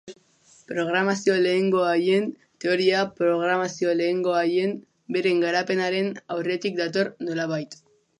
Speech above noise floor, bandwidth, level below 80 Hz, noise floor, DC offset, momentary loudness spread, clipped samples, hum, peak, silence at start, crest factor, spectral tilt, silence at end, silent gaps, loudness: 34 dB; 10.5 kHz; -74 dBFS; -57 dBFS; under 0.1%; 8 LU; under 0.1%; none; -8 dBFS; 0.05 s; 16 dB; -5 dB/octave; 0.45 s; none; -24 LUFS